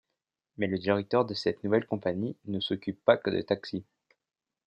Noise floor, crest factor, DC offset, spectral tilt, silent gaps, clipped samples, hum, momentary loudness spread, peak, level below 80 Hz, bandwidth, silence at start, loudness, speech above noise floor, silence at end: -86 dBFS; 22 dB; under 0.1%; -7 dB/octave; none; under 0.1%; none; 8 LU; -8 dBFS; -72 dBFS; 8.8 kHz; 0.6 s; -30 LUFS; 57 dB; 0.85 s